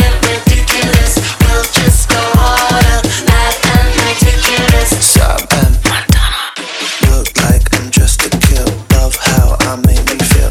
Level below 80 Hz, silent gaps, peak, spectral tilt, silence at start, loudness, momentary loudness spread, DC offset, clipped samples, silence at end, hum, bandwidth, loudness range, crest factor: -14 dBFS; none; 0 dBFS; -4 dB/octave; 0 s; -10 LUFS; 3 LU; 0.2%; 0.7%; 0 s; none; 19.5 kHz; 2 LU; 10 dB